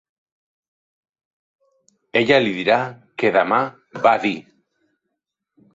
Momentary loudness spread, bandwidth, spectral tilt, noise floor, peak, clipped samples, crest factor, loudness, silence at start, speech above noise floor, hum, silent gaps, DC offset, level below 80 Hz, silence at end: 10 LU; 7.8 kHz; -5.5 dB/octave; -80 dBFS; -2 dBFS; under 0.1%; 20 dB; -19 LUFS; 2.15 s; 62 dB; none; none; under 0.1%; -64 dBFS; 1.35 s